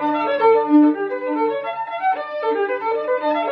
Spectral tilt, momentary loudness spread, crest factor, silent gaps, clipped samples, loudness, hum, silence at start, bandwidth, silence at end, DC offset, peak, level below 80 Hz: -7 dB/octave; 9 LU; 14 dB; none; under 0.1%; -19 LUFS; none; 0 s; 5 kHz; 0 s; under 0.1%; -4 dBFS; -74 dBFS